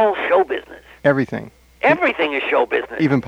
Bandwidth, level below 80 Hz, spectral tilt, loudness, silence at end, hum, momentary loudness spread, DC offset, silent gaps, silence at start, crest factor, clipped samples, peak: 10.5 kHz; -54 dBFS; -7 dB/octave; -18 LUFS; 0 s; none; 8 LU; under 0.1%; none; 0 s; 16 dB; under 0.1%; -2 dBFS